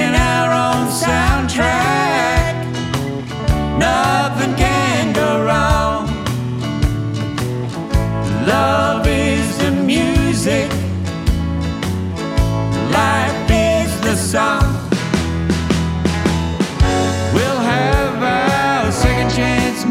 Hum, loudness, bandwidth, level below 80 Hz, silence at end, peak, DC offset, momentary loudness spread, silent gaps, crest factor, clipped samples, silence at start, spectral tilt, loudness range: none; -16 LUFS; 16 kHz; -26 dBFS; 0 s; 0 dBFS; under 0.1%; 6 LU; none; 14 dB; under 0.1%; 0 s; -5.5 dB/octave; 2 LU